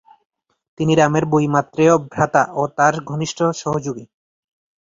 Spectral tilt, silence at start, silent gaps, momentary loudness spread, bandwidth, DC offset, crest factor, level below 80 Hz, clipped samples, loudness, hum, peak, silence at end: -6 dB/octave; 0.8 s; none; 9 LU; 7.8 kHz; under 0.1%; 18 dB; -54 dBFS; under 0.1%; -18 LUFS; none; -2 dBFS; 0.85 s